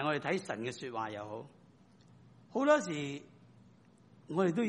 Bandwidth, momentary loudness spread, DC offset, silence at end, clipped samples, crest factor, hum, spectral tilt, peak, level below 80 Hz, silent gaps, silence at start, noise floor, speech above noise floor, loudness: 10 kHz; 17 LU; under 0.1%; 0 s; under 0.1%; 22 dB; none; -5.5 dB/octave; -14 dBFS; -78 dBFS; none; 0 s; -62 dBFS; 28 dB; -35 LUFS